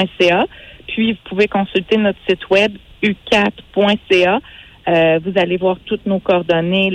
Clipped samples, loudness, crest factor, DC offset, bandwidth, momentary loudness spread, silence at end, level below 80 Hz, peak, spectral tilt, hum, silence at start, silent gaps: under 0.1%; -16 LUFS; 14 dB; under 0.1%; 10.5 kHz; 7 LU; 0 s; -46 dBFS; -2 dBFS; -6 dB/octave; none; 0 s; none